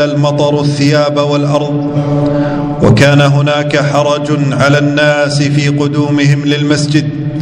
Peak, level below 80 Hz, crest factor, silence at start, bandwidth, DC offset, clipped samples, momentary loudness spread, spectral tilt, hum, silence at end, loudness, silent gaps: 0 dBFS; -40 dBFS; 10 dB; 0 s; 10.5 kHz; under 0.1%; 0.7%; 5 LU; -6 dB/octave; none; 0 s; -10 LUFS; none